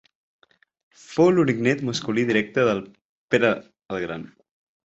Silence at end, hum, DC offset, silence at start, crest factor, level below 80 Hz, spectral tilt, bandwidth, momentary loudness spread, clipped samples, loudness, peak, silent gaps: 0.55 s; none; under 0.1%; 1.1 s; 20 dB; -62 dBFS; -6 dB/octave; 8 kHz; 12 LU; under 0.1%; -22 LUFS; -4 dBFS; 3.05-3.28 s, 3.85-3.89 s